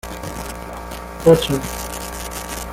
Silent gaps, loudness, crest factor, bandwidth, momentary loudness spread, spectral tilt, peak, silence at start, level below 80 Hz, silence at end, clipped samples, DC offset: none; -21 LUFS; 20 dB; 17 kHz; 17 LU; -5 dB/octave; -2 dBFS; 0.05 s; -36 dBFS; 0 s; under 0.1%; under 0.1%